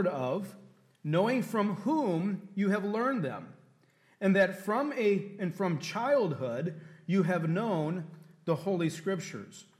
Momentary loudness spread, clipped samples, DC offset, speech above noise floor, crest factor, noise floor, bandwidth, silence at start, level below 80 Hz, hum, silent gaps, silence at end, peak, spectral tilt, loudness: 11 LU; under 0.1%; under 0.1%; 35 dB; 16 dB; -66 dBFS; 14.5 kHz; 0 s; -82 dBFS; none; none; 0.15 s; -14 dBFS; -7 dB/octave; -31 LUFS